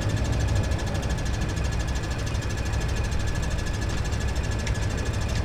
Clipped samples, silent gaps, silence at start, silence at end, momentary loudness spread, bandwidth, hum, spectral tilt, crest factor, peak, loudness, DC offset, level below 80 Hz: under 0.1%; none; 0 s; 0 s; 3 LU; 14 kHz; none; -5 dB/octave; 12 dB; -12 dBFS; -28 LUFS; under 0.1%; -30 dBFS